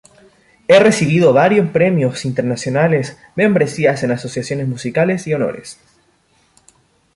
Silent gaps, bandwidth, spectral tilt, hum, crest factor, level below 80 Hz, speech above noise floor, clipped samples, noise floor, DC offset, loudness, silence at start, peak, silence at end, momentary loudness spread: none; 11.5 kHz; -6 dB/octave; none; 14 dB; -54 dBFS; 43 dB; under 0.1%; -57 dBFS; under 0.1%; -15 LUFS; 0.7 s; -2 dBFS; 1.45 s; 11 LU